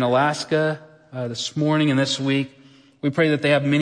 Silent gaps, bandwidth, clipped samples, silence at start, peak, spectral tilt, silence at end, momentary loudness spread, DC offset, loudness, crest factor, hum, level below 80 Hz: none; 10.5 kHz; under 0.1%; 0 s; -6 dBFS; -5.5 dB/octave; 0 s; 12 LU; under 0.1%; -21 LUFS; 16 dB; none; -68 dBFS